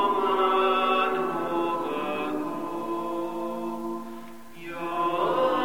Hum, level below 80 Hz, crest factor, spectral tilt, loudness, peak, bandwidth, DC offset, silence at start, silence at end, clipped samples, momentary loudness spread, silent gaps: none; -64 dBFS; 14 dB; -5 dB/octave; -27 LUFS; -12 dBFS; 17 kHz; 0.7%; 0 s; 0 s; under 0.1%; 14 LU; none